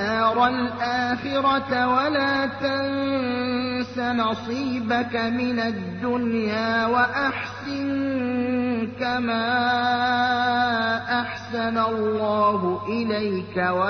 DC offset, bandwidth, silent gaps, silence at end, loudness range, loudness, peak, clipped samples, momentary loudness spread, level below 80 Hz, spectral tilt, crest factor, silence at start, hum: under 0.1%; 6.4 kHz; none; 0 s; 2 LU; -23 LUFS; -8 dBFS; under 0.1%; 5 LU; -58 dBFS; -6 dB/octave; 14 dB; 0 s; 50 Hz at -45 dBFS